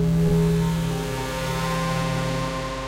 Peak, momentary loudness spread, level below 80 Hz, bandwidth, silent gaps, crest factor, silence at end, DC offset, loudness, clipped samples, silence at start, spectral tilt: -10 dBFS; 7 LU; -36 dBFS; 16 kHz; none; 12 dB; 0 s; under 0.1%; -24 LUFS; under 0.1%; 0 s; -6 dB/octave